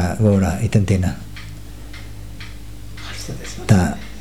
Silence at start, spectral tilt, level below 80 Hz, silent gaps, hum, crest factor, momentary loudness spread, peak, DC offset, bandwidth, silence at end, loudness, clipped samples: 0 s; -6.5 dB/octave; -36 dBFS; none; none; 20 dB; 20 LU; 0 dBFS; 2%; 15 kHz; 0 s; -19 LUFS; under 0.1%